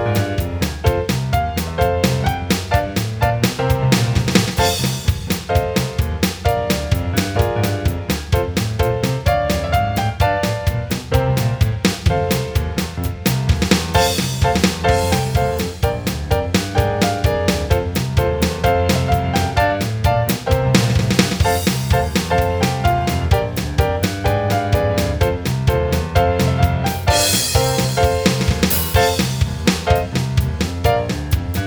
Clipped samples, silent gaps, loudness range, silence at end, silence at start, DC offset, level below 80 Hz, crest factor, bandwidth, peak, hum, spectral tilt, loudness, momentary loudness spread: under 0.1%; none; 3 LU; 0 s; 0 s; under 0.1%; -26 dBFS; 16 dB; over 20 kHz; 0 dBFS; none; -5 dB/octave; -18 LUFS; 5 LU